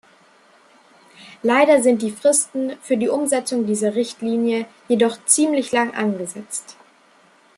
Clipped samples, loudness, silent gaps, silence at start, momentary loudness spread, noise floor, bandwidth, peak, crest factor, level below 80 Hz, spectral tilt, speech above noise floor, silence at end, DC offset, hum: under 0.1%; -19 LUFS; none; 1.2 s; 11 LU; -54 dBFS; 13 kHz; 0 dBFS; 20 dB; -70 dBFS; -3.5 dB/octave; 35 dB; 0.85 s; under 0.1%; none